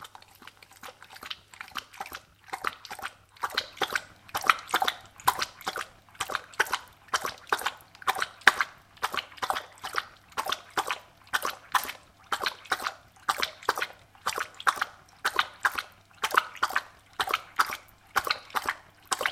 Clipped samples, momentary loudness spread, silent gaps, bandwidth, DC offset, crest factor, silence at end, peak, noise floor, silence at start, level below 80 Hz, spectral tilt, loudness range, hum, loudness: under 0.1%; 14 LU; none; 16.5 kHz; under 0.1%; 32 dB; 0 s; 0 dBFS; -52 dBFS; 0 s; -64 dBFS; 0 dB/octave; 4 LU; none; -30 LUFS